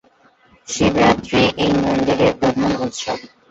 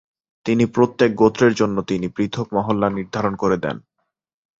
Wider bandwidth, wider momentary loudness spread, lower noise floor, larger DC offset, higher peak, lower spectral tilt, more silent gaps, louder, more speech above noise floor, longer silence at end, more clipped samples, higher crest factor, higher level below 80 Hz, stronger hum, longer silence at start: about the same, 8.2 kHz vs 7.8 kHz; first, 11 LU vs 8 LU; second, -54 dBFS vs -75 dBFS; neither; about the same, -2 dBFS vs -2 dBFS; second, -5 dB/octave vs -6.5 dB/octave; neither; about the same, -17 LUFS vs -19 LUFS; second, 37 dB vs 56 dB; second, 0.25 s vs 0.8 s; neither; about the same, 16 dB vs 18 dB; first, -42 dBFS vs -52 dBFS; neither; first, 0.7 s vs 0.45 s